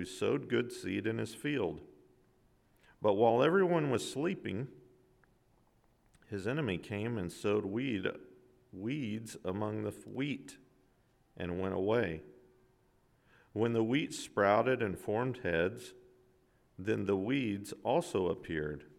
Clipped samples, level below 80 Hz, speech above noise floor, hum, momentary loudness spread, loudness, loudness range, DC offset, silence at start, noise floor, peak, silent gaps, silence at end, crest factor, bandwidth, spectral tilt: under 0.1%; -66 dBFS; 36 dB; none; 13 LU; -34 LUFS; 7 LU; under 0.1%; 0 s; -70 dBFS; -16 dBFS; none; 0.1 s; 20 dB; 15 kHz; -6 dB/octave